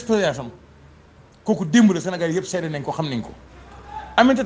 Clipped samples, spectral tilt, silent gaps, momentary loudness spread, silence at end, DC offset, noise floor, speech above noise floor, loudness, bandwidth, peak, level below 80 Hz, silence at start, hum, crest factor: under 0.1%; -5.5 dB/octave; none; 20 LU; 0 s; under 0.1%; -49 dBFS; 30 dB; -21 LUFS; 9.8 kHz; 0 dBFS; -50 dBFS; 0 s; none; 20 dB